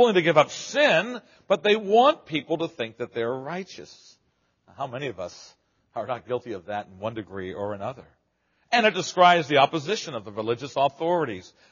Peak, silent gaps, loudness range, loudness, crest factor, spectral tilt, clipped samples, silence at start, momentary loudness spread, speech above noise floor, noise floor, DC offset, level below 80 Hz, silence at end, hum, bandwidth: -4 dBFS; none; 12 LU; -24 LUFS; 22 dB; -2.5 dB/octave; under 0.1%; 0 s; 16 LU; 46 dB; -70 dBFS; under 0.1%; -70 dBFS; 0.3 s; none; 7.2 kHz